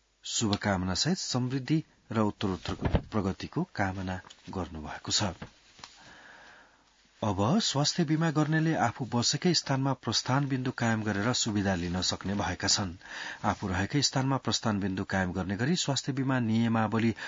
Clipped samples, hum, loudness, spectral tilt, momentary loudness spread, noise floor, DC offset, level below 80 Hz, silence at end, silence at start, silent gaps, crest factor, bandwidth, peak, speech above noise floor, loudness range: under 0.1%; none; -29 LUFS; -4.5 dB/octave; 10 LU; -63 dBFS; under 0.1%; -52 dBFS; 0 s; 0.25 s; none; 20 dB; 7.8 kHz; -10 dBFS; 34 dB; 6 LU